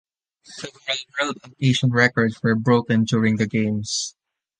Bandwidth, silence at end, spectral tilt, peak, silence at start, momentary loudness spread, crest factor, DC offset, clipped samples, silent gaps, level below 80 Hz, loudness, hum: 9.8 kHz; 0.5 s; -5 dB/octave; -2 dBFS; 0.5 s; 14 LU; 20 dB; under 0.1%; under 0.1%; none; -58 dBFS; -21 LUFS; none